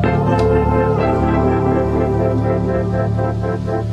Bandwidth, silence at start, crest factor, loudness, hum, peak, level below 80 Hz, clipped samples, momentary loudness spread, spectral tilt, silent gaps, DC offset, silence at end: 7.8 kHz; 0 s; 12 dB; -17 LUFS; none; -4 dBFS; -26 dBFS; under 0.1%; 5 LU; -9 dB/octave; none; under 0.1%; 0 s